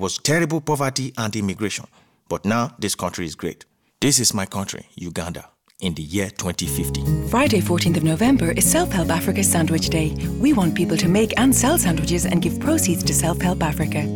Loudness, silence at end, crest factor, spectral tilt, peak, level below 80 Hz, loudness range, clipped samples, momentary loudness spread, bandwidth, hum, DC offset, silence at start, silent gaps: -20 LUFS; 0 s; 16 dB; -4.5 dB/octave; -4 dBFS; -36 dBFS; 6 LU; under 0.1%; 12 LU; 19.5 kHz; none; under 0.1%; 0 s; none